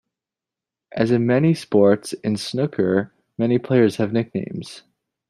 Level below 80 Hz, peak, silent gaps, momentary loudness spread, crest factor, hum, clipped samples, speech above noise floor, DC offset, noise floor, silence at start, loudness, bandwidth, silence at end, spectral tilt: -62 dBFS; -4 dBFS; none; 14 LU; 18 dB; none; under 0.1%; 69 dB; under 0.1%; -88 dBFS; 0.95 s; -20 LUFS; 13 kHz; 0.5 s; -7 dB/octave